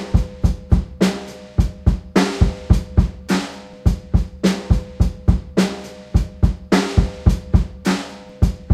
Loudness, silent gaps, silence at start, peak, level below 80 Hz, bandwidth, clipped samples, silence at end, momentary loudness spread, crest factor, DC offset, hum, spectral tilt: -20 LUFS; none; 0 s; 0 dBFS; -22 dBFS; 13.5 kHz; under 0.1%; 0 s; 5 LU; 18 dB; under 0.1%; none; -6.5 dB/octave